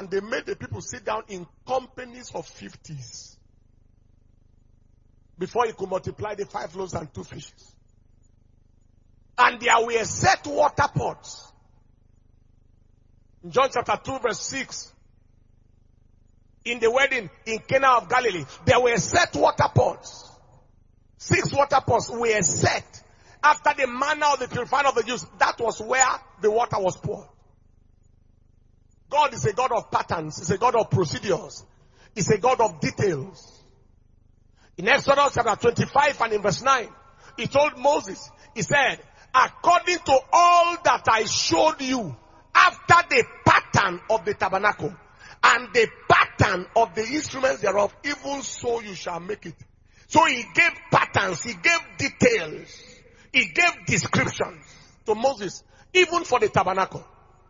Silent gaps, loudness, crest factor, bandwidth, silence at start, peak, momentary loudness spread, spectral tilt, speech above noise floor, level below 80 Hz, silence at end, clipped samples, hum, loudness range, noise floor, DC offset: none; -22 LUFS; 24 dB; 7.6 kHz; 0 s; 0 dBFS; 17 LU; -3.5 dB/octave; 35 dB; -54 dBFS; 0.45 s; under 0.1%; 50 Hz at -60 dBFS; 11 LU; -57 dBFS; under 0.1%